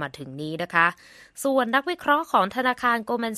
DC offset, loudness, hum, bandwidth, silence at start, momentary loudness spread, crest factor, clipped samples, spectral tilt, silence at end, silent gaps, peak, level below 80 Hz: under 0.1%; -23 LUFS; none; 14 kHz; 0 s; 11 LU; 20 dB; under 0.1%; -4 dB/octave; 0 s; none; -4 dBFS; -64 dBFS